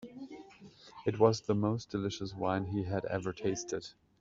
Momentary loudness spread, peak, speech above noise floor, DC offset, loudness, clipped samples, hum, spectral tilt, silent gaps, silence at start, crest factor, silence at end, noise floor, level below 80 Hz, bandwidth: 21 LU; -12 dBFS; 23 dB; under 0.1%; -34 LUFS; under 0.1%; none; -6 dB/octave; none; 0 s; 24 dB; 0.3 s; -56 dBFS; -66 dBFS; 7.8 kHz